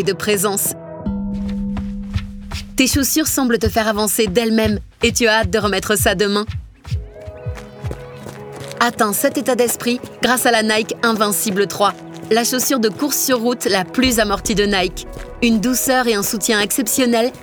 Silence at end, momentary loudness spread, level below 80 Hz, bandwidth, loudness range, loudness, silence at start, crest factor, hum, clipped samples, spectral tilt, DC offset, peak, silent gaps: 0 s; 15 LU; -36 dBFS; over 20 kHz; 4 LU; -17 LUFS; 0 s; 16 dB; none; under 0.1%; -3.5 dB/octave; under 0.1%; -2 dBFS; none